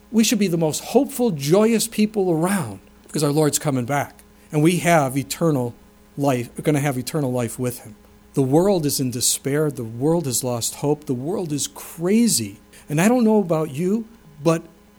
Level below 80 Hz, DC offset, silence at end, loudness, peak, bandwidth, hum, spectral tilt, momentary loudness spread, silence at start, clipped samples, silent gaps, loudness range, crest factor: -54 dBFS; under 0.1%; 0.3 s; -21 LUFS; -4 dBFS; over 20 kHz; none; -5 dB/octave; 9 LU; 0.1 s; under 0.1%; none; 2 LU; 18 dB